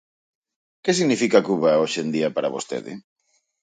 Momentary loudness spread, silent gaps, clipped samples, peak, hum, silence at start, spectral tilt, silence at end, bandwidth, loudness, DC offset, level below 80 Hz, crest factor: 13 LU; none; under 0.1%; -4 dBFS; none; 0.85 s; -4.5 dB/octave; 0.65 s; 9.6 kHz; -21 LUFS; under 0.1%; -70 dBFS; 20 dB